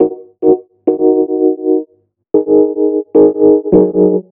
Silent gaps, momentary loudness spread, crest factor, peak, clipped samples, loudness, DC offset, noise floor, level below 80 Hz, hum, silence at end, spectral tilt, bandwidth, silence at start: none; 7 LU; 12 dB; 0 dBFS; under 0.1%; -12 LUFS; under 0.1%; -52 dBFS; -46 dBFS; none; 0.15 s; -13.5 dB/octave; 1.8 kHz; 0 s